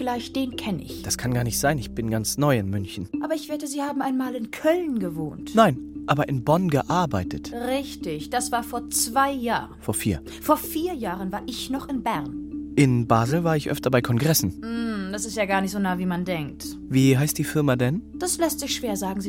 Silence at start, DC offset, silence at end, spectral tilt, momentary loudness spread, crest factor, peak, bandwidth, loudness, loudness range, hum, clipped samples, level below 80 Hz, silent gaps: 0 s; under 0.1%; 0 s; -5 dB/octave; 9 LU; 20 dB; -4 dBFS; 16.5 kHz; -24 LUFS; 3 LU; none; under 0.1%; -46 dBFS; none